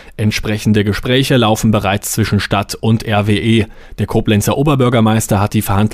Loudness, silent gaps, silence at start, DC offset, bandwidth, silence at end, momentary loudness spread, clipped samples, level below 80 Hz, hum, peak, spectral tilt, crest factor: -14 LUFS; none; 0 s; under 0.1%; 16 kHz; 0 s; 5 LU; under 0.1%; -32 dBFS; none; -2 dBFS; -5.5 dB/octave; 10 dB